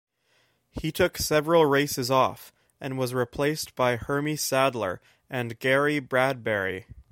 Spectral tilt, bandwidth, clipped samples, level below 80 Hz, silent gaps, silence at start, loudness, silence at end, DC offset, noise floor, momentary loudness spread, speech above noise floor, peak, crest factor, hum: -4.5 dB/octave; 16.5 kHz; under 0.1%; -52 dBFS; none; 0.75 s; -25 LUFS; 0.1 s; under 0.1%; -68 dBFS; 13 LU; 42 dB; -6 dBFS; 20 dB; none